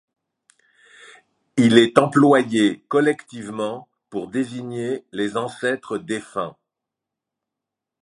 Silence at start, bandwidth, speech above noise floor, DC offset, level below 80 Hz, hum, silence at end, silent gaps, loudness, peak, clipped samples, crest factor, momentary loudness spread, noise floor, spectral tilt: 1.55 s; 11.5 kHz; 65 dB; under 0.1%; -64 dBFS; none; 1.5 s; none; -20 LUFS; 0 dBFS; under 0.1%; 22 dB; 15 LU; -85 dBFS; -5.5 dB/octave